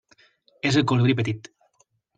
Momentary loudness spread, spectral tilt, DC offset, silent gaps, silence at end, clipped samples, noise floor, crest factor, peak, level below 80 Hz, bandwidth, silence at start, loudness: 9 LU; -6 dB/octave; under 0.1%; none; 0.8 s; under 0.1%; -67 dBFS; 18 dB; -8 dBFS; -60 dBFS; 9.2 kHz; 0.65 s; -22 LUFS